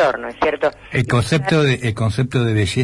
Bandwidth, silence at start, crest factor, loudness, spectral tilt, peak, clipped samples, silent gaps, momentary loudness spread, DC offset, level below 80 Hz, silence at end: 11.5 kHz; 0 s; 14 dB; -18 LUFS; -6 dB/octave; -4 dBFS; under 0.1%; none; 4 LU; under 0.1%; -44 dBFS; 0 s